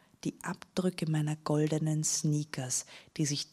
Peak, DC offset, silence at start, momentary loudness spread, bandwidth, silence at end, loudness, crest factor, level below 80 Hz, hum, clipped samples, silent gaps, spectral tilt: -16 dBFS; under 0.1%; 0.25 s; 9 LU; 14.5 kHz; 0.1 s; -32 LUFS; 16 dB; -70 dBFS; none; under 0.1%; none; -4.5 dB/octave